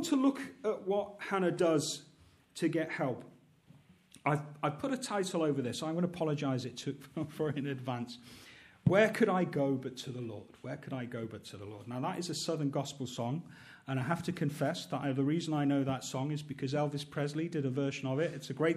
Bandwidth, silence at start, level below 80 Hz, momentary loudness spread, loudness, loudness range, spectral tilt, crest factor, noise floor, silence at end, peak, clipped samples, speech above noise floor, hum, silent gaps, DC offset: 14 kHz; 0 s; -72 dBFS; 13 LU; -35 LUFS; 5 LU; -6 dB/octave; 20 dB; -62 dBFS; 0 s; -14 dBFS; under 0.1%; 28 dB; none; none; under 0.1%